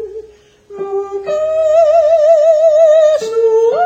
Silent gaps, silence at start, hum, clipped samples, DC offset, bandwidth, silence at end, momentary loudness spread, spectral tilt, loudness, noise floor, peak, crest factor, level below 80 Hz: none; 0 s; none; under 0.1%; under 0.1%; 8 kHz; 0 s; 12 LU; -3.5 dB/octave; -11 LUFS; -41 dBFS; 0 dBFS; 10 dB; -52 dBFS